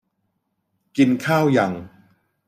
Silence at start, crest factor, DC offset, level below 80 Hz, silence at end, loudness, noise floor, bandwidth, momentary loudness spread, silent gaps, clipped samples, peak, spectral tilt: 0.95 s; 18 dB; under 0.1%; -64 dBFS; 0.6 s; -19 LUFS; -73 dBFS; 15 kHz; 12 LU; none; under 0.1%; -4 dBFS; -6.5 dB/octave